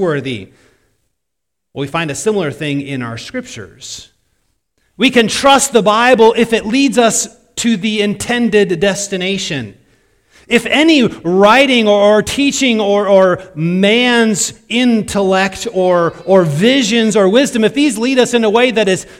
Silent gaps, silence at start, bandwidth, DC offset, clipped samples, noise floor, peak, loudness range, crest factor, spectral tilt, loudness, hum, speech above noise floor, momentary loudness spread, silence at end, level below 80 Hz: none; 0 s; 16 kHz; under 0.1%; 0.3%; -78 dBFS; 0 dBFS; 10 LU; 12 dB; -4 dB/octave; -12 LUFS; none; 66 dB; 13 LU; 0.15 s; -48 dBFS